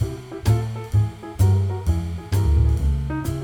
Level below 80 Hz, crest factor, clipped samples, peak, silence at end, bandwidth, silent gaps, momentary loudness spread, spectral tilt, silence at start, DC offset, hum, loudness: -26 dBFS; 14 dB; under 0.1%; -6 dBFS; 0 s; 16.5 kHz; none; 7 LU; -7.5 dB/octave; 0 s; under 0.1%; none; -22 LUFS